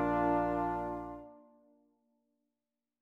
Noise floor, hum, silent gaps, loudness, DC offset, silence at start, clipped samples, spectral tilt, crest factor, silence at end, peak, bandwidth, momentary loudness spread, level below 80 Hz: under -90 dBFS; none; none; -34 LUFS; under 0.1%; 0 s; under 0.1%; -9 dB/octave; 18 dB; 1.6 s; -20 dBFS; 7.4 kHz; 19 LU; -56 dBFS